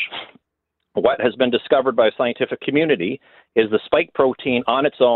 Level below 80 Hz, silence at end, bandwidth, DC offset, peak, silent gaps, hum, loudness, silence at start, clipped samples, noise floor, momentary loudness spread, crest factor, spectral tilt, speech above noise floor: -58 dBFS; 0 s; 4.3 kHz; under 0.1%; -2 dBFS; none; none; -19 LUFS; 0 s; under 0.1%; -78 dBFS; 8 LU; 16 dB; -9.5 dB/octave; 59 dB